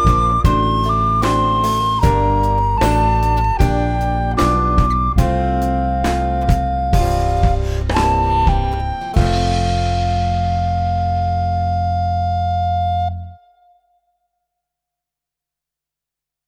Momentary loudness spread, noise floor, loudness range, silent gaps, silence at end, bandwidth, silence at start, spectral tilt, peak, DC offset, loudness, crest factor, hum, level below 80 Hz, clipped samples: 4 LU; -85 dBFS; 6 LU; none; 3.15 s; 16.5 kHz; 0 s; -7 dB/octave; 0 dBFS; under 0.1%; -17 LUFS; 16 dB; none; -22 dBFS; under 0.1%